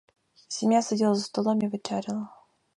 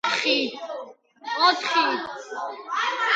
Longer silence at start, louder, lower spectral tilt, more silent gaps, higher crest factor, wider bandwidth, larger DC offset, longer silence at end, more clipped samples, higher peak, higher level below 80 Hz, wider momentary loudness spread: first, 0.5 s vs 0.05 s; second, -27 LUFS vs -23 LUFS; first, -5 dB/octave vs -1 dB/octave; neither; about the same, 18 dB vs 20 dB; first, 11 kHz vs 9.2 kHz; neither; first, 0.45 s vs 0 s; neither; second, -10 dBFS vs -6 dBFS; about the same, -74 dBFS vs -76 dBFS; second, 12 LU vs 16 LU